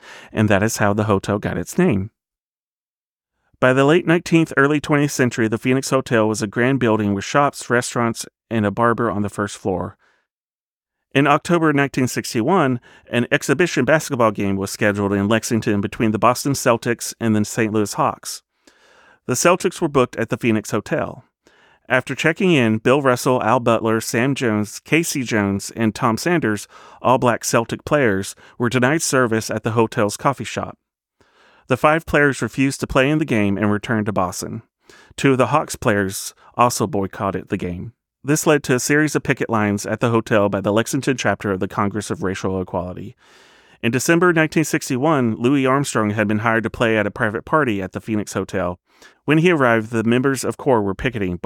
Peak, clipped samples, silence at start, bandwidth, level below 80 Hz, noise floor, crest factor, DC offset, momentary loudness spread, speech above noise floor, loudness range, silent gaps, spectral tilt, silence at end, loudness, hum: -2 dBFS; under 0.1%; 0.05 s; 18 kHz; -50 dBFS; under -90 dBFS; 18 dB; under 0.1%; 8 LU; over 71 dB; 3 LU; 2.40-2.55 s, 2.62-3.18 s, 10.31-10.81 s; -5 dB/octave; 0.05 s; -19 LUFS; none